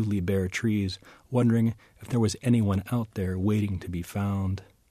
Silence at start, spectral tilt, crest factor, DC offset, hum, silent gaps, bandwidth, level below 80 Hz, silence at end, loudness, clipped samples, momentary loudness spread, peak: 0 s; -7 dB/octave; 14 dB; under 0.1%; none; none; 14.5 kHz; -54 dBFS; 0.25 s; -28 LUFS; under 0.1%; 9 LU; -12 dBFS